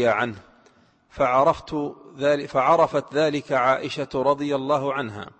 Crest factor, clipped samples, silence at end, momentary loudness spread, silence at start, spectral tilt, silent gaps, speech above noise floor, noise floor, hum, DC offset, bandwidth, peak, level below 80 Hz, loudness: 16 dB; under 0.1%; 0.1 s; 10 LU; 0 s; -6 dB/octave; none; 36 dB; -58 dBFS; none; under 0.1%; 8.6 kHz; -6 dBFS; -56 dBFS; -22 LUFS